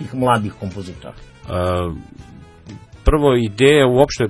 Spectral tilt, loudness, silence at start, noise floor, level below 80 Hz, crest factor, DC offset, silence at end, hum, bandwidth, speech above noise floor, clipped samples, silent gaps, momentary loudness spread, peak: -6 dB/octave; -16 LUFS; 0 s; -39 dBFS; -30 dBFS; 18 dB; under 0.1%; 0 s; none; 11 kHz; 22 dB; under 0.1%; none; 21 LU; 0 dBFS